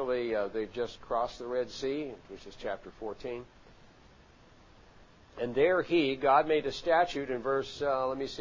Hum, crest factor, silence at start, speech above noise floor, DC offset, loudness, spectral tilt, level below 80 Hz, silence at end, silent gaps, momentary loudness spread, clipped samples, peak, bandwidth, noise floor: none; 20 dB; 0 s; 27 dB; under 0.1%; -31 LUFS; -5 dB/octave; -60 dBFS; 0 s; none; 15 LU; under 0.1%; -12 dBFS; 7.6 kHz; -58 dBFS